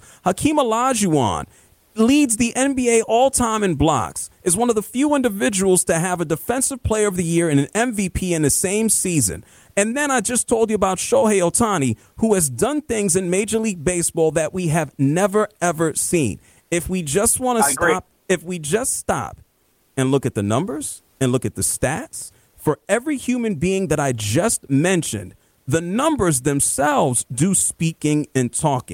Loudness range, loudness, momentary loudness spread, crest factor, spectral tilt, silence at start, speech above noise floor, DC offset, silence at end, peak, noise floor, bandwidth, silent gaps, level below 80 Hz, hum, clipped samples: 4 LU; -19 LUFS; 7 LU; 16 dB; -4.5 dB/octave; 0.25 s; 43 dB; under 0.1%; 0 s; -4 dBFS; -62 dBFS; 17 kHz; none; -44 dBFS; none; under 0.1%